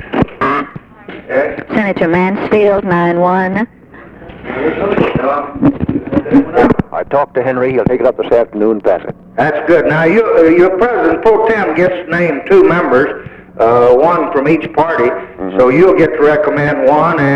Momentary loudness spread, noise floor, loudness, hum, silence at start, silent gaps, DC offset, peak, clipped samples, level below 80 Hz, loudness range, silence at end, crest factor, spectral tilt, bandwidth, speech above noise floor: 9 LU; -34 dBFS; -11 LUFS; none; 0 s; none; under 0.1%; 0 dBFS; under 0.1%; -38 dBFS; 3 LU; 0 s; 10 dB; -8.5 dB/octave; 7.4 kHz; 24 dB